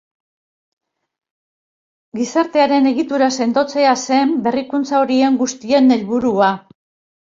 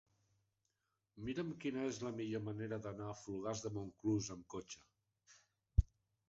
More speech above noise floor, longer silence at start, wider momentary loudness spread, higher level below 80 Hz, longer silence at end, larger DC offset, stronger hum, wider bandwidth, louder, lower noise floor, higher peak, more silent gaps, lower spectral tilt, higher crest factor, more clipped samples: first, over 75 dB vs 44 dB; first, 2.15 s vs 1.15 s; second, 6 LU vs 11 LU; second, -62 dBFS vs -48 dBFS; first, 0.7 s vs 0.45 s; neither; neither; about the same, 7.6 kHz vs 8 kHz; first, -16 LUFS vs -43 LUFS; about the same, under -90 dBFS vs -88 dBFS; first, -2 dBFS vs -16 dBFS; neither; second, -4 dB/octave vs -7 dB/octave; second, 16 dB vs 26 dB; neither